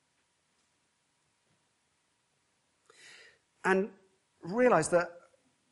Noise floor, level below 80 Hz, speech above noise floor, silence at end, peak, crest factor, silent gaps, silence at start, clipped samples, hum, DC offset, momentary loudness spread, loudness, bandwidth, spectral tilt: -76 dBFS; -72 dBFS; 48 dB; 0.55 s; -10 dBFS; 24 dB; none; 3.65 s; under 0.1%; none; under 0.1%; 15 LU; -30 LUFS; 11.5 kHz; -5 dB/octave